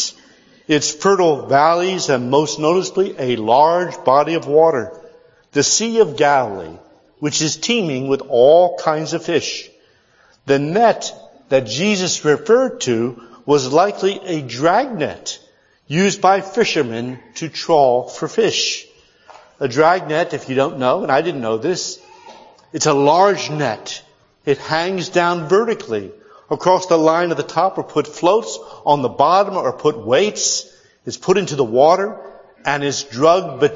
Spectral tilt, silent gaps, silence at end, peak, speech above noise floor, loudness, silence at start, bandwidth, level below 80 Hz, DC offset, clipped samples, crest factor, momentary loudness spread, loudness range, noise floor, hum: -4 dB/octave; none; 0 s; 0 dBFS; 38 dB; -17 LUFS; 0 s; 7.8 kHz; -62 dBFS; under 0.1%; under 0.1%; 16 dB; 12 LU; 3 LU; -54 dBFS; none